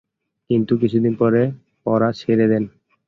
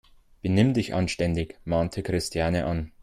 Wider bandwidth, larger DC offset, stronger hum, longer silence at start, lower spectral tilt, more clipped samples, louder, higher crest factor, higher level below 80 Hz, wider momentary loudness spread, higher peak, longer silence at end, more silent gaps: second, 6.4 kHz vs 14 kHz; neither; neither; about the same, 0.5 s vs 0.45 s; first, -9.5 dB/octave vs -6 dB/octave; neither; first, -19 LUFS vs -26 LUFS; about the same, 14 dB vs 18 dB; second, -56 dBFS vs -44 dBFS; about the same, 6 LU vs 7 LU; first, -4 dBFS vs -8 dBFS; first, 0.4 s vs 0.15 s; neither